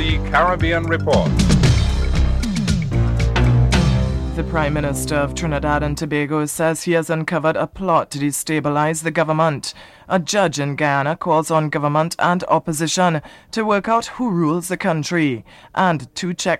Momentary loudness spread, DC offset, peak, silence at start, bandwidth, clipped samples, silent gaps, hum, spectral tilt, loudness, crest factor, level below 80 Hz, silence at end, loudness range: 6 LU; under 0.1%; -2 dBFS; 0 s; 15 kHz; under 0.1%; none; none; -5.5 dB/octave; -19 LUFS; 16 dB; -26 dBFS; 0 s; 2 LU